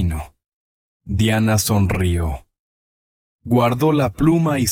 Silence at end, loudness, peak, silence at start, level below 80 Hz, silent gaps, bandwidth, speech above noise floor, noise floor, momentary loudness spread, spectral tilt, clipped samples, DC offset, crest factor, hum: 0 s; -18 LUFS; -4 dBFS; 0 s; -34 dBFS; 0.48-1.00 s, 2.59-3.39 s; 17 kHz; over 73 dB; under -90 dBFS; 14 LU; -6 dB/octave; under 0.1%; under 0.1%; 16 dB; none